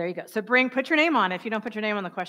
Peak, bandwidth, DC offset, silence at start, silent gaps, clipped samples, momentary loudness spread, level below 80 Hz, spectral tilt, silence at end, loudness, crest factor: -8 dBFS; 16 kHz; under 0.1%; 0 s; none; under 0.1%; 9 LU; -78 dBFS; -5 dB/octave; 0 s; -24 LUFS; 18 dB